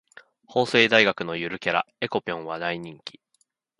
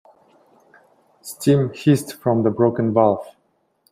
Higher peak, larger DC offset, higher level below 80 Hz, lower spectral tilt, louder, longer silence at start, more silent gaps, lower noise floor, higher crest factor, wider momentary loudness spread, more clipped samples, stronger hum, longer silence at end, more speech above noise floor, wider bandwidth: about the same, -2 dBFS vs -2 dBFS; neither; about the same, -66 dBFS vs -62 dBFS; second, -4.5 dB/octave vs -7 dB/octave; second, -23 LUFS vs -19 LUFS; second, 0.5 s vs 1.25 s; neither; first, -70 dBFS vs -66 dBFS; first, 24 dB vs 18 dB; first, 17 LU vs 9 LU; neither; neither; about the same, 0.7 s vs 0.6 s; about the same, 46 dB vs 48 dB; second, 11.5 kHz vs 16 kHz